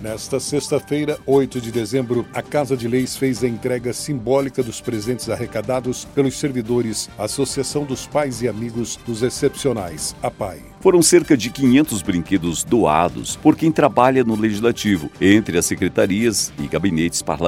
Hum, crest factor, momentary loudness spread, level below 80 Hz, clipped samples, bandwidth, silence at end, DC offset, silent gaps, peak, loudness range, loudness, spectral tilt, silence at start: none; 18 dB; 9 LU; -46 dBFS; under 0.1%; 16.5 kHz; 0 s; under 0.1%; none; 0 dBFS; 6 LU; -19 LUFS; -4.5 dB/octave; 0 s